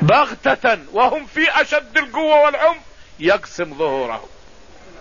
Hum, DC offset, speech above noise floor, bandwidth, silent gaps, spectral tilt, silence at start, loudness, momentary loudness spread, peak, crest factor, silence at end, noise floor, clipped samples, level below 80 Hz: none; 0.6%; 27 dB; 7.4 kHz; none; -5.5 dB/octave; 0 s; -17 LUFS; 10 LU; -2 dBFS; 14 dB; 0.75 s; -44 dBFS; under 0.1%; -48 dBFS